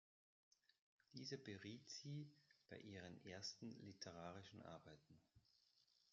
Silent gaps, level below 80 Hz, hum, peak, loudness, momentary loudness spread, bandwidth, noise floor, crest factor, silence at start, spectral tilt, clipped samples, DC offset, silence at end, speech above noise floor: none; under -90 dBFS; none; -40 dBFS; -57 LUFS; 10 LU; 7.4 kHz; -81 dBFS; 20 dB; 1.1 s; -4 dB/octave; under 0.1%; under 0.1%; 0.1 s; 23 dB